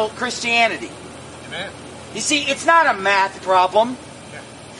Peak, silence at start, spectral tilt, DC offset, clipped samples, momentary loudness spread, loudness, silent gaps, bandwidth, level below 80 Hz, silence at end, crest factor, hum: 0 dBFS; 0 s; -2 dB/octave; under 0.1%; under 0.1%; 21 LU; -17 LUFS; none; 11.5 kHz; -56 dBFS; 0 s; 20 dB; none